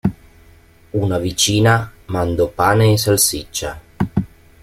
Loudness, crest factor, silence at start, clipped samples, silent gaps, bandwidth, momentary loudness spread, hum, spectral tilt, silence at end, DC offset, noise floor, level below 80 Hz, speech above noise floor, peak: -17 LUFS; 16 dB; 0.05 s; under 0.1%; none; 16.5 kHz; 12 LU; none; -4.5 dB/octave; 0.35 s; under 0.1%; -47 dBFS; -40 dBFS; 31 dB; -2 dBFS